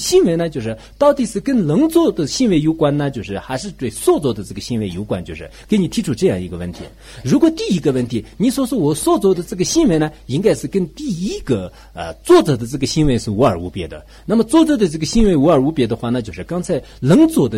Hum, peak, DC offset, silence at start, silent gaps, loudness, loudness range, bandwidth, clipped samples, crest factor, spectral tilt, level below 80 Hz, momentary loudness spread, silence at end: none; -2 dBFS; under 0.1%; 0 s; none; -17 LUFS; 4 LU; 16 kHz; under 0.1%; 14 dB; -6 dB/octave; -36 dBFS; 13 LU; 0 s